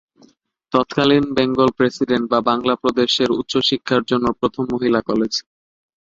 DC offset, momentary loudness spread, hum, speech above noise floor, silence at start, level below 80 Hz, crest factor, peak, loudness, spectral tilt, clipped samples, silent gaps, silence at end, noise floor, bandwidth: under 0.1%; 5 LU; none; 37 dB; 0.7 s; -52 dBFS; 18 dB; 0 dBFS; -18 LUFS; -5 dB/octave; under 0.1%; none; 0.6 s; -55 dBFS; 7.8 kHz